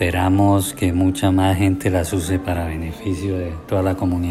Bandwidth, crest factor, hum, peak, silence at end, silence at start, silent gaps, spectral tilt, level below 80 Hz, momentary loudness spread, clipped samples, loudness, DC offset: 15 kHz; 14 dB; none; -4 dBFS; 0 s; 0 s; none; -6.5 dB/octave; -40 dBFS; 8 LU; under 0.1%; -19 LUFS; under 0.1%